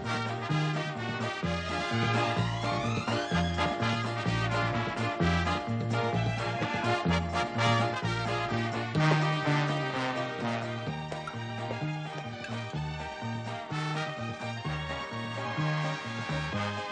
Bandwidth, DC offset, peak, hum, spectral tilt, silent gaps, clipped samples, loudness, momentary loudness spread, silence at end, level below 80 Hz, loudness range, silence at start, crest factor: 9.8 kHz; under 0.1%; -12 dBFS; none; -6 dB/octave; none; under 0.1%; -31 LUFS; 8 LU; 0 s; -50 dBFS; 7 LU; 0 s; 18 dB